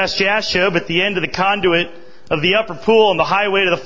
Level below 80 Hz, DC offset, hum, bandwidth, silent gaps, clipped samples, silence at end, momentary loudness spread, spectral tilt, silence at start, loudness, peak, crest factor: -48 dBFS; 2%; none; 7.6 kHz; none; under 0.1%; 0 s; 5 LU; -4.5 dB/octave; 0 s; -15 LUFS; 0 dBFS; 16 dB